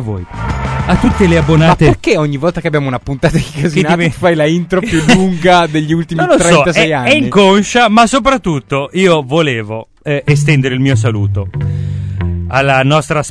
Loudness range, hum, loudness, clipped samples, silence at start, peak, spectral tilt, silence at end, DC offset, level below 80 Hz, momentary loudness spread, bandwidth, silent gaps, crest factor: 4 LU; none; -11 LUFS; 0.1%; 0 s; 0 dBFS; -5.5 dB/octave; 0 s; under 0.1%; -28 dBFS; 10 LU; 11 kHz; none; 10 dB